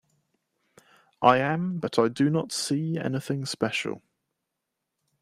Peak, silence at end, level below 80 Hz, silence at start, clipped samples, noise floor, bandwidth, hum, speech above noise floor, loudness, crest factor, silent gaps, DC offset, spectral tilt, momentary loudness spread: -4 dBFS; 1.25 s; -70 dBFS; 1.2 s; under 0.1%; -83 dBFS; 15 kHz; none; 58 dB; -26 LUFS; 24 dB; none; under 0.1%; -5 dB/octave; 9 LU